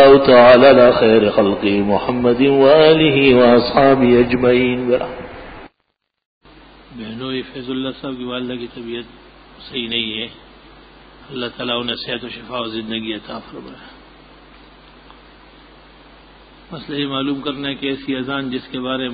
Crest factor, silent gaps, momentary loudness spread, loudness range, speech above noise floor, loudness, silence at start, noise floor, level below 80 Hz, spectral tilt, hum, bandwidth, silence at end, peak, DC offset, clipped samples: 16 dB; 6.25-6.41 s; 20 LU; 17 LU; 56 dB; -15 LUFS; 0 s; -71 dBFS; -44 dBFS; -9.5 dB/octave; none; 5 kHz; 0 s; 0 dBFS; under 0.1%; under 0.1%